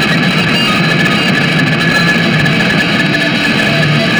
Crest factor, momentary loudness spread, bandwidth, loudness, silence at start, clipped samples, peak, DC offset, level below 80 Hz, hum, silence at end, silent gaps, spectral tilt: 10 dB; 1 LU; over 20 kHz; -10 LUFS; 0 s; under 0.1%; 0 dBFS; under 0.1%; -40 dBFS; none; 0 s; none; -5 dB/octave